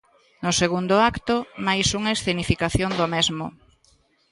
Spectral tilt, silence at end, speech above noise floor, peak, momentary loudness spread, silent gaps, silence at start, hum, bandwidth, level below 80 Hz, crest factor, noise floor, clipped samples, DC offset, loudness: -4 dB/octave; 0.8 s; 39 dB; -6 dBFS; 6 LU; none; 0.4 s; none; 11.5 kHz; -42 dBFS; 18 dB; -61 dBFS; under 0.1%; under 0.1%; -22 LUFS